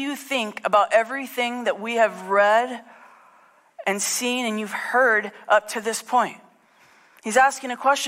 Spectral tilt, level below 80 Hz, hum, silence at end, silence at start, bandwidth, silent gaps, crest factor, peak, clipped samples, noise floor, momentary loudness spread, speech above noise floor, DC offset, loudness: -2 dB/octave; -74 dBFS; none; 0 s; 0 s; 16 kHz; none; 16 dB; -6 dBFS; under 0.1%; -56 dBFS; 9 LU; 34 dB; under 0.1%; -22 LUFS